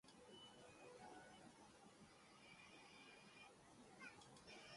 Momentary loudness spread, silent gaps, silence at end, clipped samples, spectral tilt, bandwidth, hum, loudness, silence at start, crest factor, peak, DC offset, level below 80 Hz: 6 LU; none; 0 s; under 0.1%; -3 dB/octave; 11.5 kHz; none; -64 LUFS; 0.05 s; 18 dB; -48 dBFS; under 0.1%; -86 dBFS